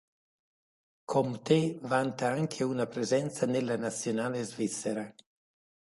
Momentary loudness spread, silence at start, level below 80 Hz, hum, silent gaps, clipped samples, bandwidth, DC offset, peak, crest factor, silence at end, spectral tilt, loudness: 7 LU; 1.1 s; -74 dBFS; none; none; under 0.1%; 11.5 kHz; under 0.1%; -12 dBFS; 20 dB; 0.75 s; -5.5 dB/octave; -31 LUFS